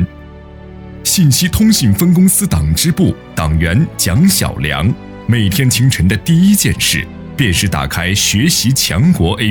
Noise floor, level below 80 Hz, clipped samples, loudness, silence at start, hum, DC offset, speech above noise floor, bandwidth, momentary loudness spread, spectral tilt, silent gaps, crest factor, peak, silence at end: -33 dBFS; -28 dBFS; under 0.1%; -12 LUFS; 0 s; none; under 0.1%; 21 dB; 19.5 kHz; 7 LU; -4 dB/octave; none; 10 dB; -2 dBFS; 0 s